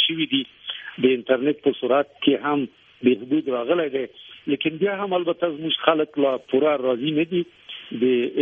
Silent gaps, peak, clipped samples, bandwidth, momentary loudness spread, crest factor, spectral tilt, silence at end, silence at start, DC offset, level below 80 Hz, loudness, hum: none; -2 dBFS; under 0.1%; 3.9 kHz; 12 LU; 20 dB; -8 dB/octave; 0 s; 0 s; under 0.1%; -68 dBFS; -22 LUFS; none